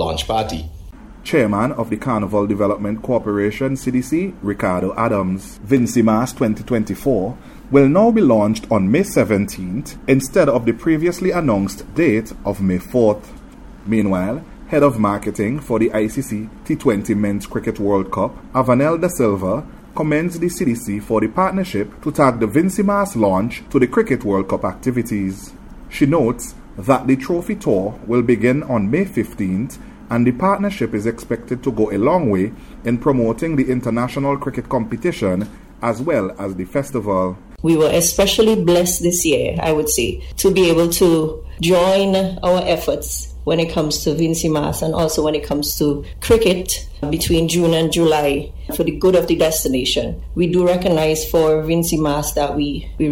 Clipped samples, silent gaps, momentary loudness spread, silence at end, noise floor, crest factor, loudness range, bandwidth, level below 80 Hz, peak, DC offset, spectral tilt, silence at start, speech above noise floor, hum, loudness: under 0.1%; none; 9 LU; 0 s; -38 dBFS; 16 dB; 4 LU; 16.5 kHz; -36 dBFS; 0 dBFS; under 0.1%; -5.5 dB/octave; 0 s; 20 dB; none; -18 LUFS